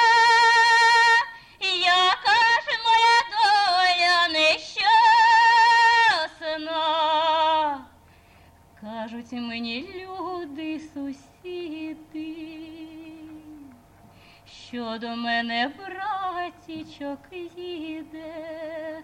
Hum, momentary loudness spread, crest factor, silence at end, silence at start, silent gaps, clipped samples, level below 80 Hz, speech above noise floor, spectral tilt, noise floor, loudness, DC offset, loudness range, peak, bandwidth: none; 21 LU; 14 dB; 0 s; 0 s; none; under 0.1%; -62 dBFS; 23 dB; -1 dB/octave; -53 dBFS; -19 LUFS; under 0.1%; 19 LU; -8 dBFS; 12 kHz